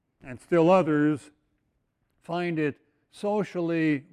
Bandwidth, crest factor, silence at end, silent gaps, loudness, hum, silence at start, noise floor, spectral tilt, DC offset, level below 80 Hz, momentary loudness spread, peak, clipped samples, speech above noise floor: 10.5 kHz; 18 dB; 0.1 s; none; -26 LUFS; none; 0.25 s; -74 dBFS; -7.5 dB/octave; under 0.1%; -66 dBFS; 14 LU; -8 dBFS; under 0.1%; 49 dB